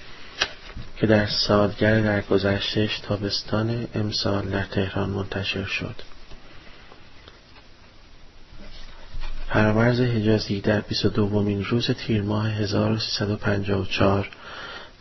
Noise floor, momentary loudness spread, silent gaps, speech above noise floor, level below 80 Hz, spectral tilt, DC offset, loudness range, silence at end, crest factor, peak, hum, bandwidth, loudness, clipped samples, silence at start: -47 dBFS; 17 LU; none; 25 dB; -40 dBFS; -6 dB/octave; under 0.1%; 9 LU; 0.1 s; 20 dB; -4 dBFS; none; 6.2 kHz; -23 LUFS; under 0.1%; 0 s